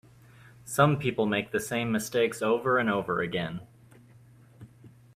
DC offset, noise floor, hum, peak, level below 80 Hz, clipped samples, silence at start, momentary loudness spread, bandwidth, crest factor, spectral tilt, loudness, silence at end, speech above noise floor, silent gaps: under 0.1%; -55 dBFS; none; -8 dBFS; -62 dBFS; under 0.1%; 0.45 s; 9 LU; 15.5 kHz; 22 dB; -5.5 dB/octave; -27 LUFS; 0.25 s; 28 dB; none